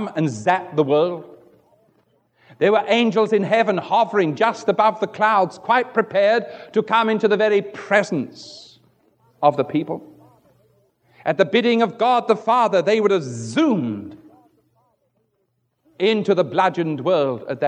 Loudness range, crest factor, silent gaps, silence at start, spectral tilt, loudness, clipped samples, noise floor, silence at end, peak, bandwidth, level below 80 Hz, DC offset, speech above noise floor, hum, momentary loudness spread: 5 LU; 18 dB; none; 0 s; -6 dB/octave; -19 LUFS; under 0.1%; -70 dBFS; 0 s; -2 dBFS; 9.4 kHz; -74 dBFS; under 0.1%; 51 dB; none; 8 LU